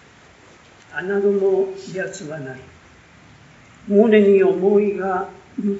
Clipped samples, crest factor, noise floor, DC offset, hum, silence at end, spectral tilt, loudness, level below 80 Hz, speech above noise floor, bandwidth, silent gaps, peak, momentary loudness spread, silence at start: under 0.1%; 18 dB; -48 dBFS; under 0.1%; none; 0 s; -6.5 dB/octave; -18 LUFS; -60 dBFS; 30 dB; 8 kHz; none; -2 dBFS; 19 LU; 0.9 s